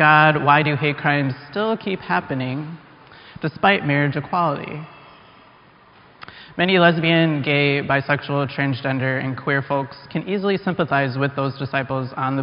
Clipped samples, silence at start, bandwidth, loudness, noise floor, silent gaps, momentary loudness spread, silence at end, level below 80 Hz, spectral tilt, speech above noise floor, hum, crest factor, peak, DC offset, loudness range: under 0.1%; 0 s; 5.4 kHz; -20 LUFS; -50 dBFS; none; 14 LU; 0 s; -58 dBFS; -4 dB/octave; 30 dB; none; 20 dB; 0 dBFS; under 0.1%; 4 LU